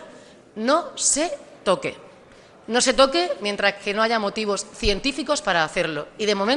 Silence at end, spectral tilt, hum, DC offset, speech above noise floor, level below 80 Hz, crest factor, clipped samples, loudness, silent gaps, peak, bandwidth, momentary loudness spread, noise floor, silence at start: 0 s; -2 dB/octave; none; under 0.1%; 27 dB; -42 dBFS; 20 dB; under 0.1%; -22 LUFS; none; -4 dBFS; 11.5 kHz; 8 LU; -49 dBFS; 0 s